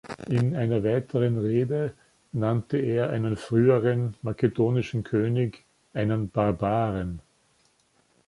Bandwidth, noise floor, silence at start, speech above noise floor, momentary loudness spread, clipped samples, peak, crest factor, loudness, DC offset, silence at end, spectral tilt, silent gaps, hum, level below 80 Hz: 11 kHz; -66 dBFS; 0.05 s; 41 dB; 8 LU; under 0.1%; -8 dBFS; 18 dB; -26 LUFS; under 0.1%; 1.1 s; -9 dB/octave; none; none; -52 dBFS